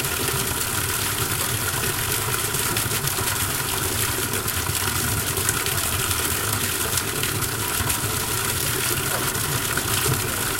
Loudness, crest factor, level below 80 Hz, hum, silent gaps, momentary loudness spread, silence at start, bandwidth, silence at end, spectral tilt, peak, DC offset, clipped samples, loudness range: -22 LUFS; 20 dB; -40 dBFS; none; none; 1 LU; 0 s; 17 kHz; 0 s; -2.5 dB/octave; -2 dBFS; under 0.1%; under 0.1%; 0 LU